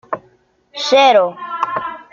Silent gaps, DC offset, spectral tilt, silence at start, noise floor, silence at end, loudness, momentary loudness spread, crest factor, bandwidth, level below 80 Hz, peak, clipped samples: none; under 0.1%; -2.5 dB/octave; 0.1 s; -54 dBFS; 0.1 s; -15 LUFS; 18 LU; 16 dB; 7.4 kHz; -62 dBFS; 0 dBFS; under 0.1%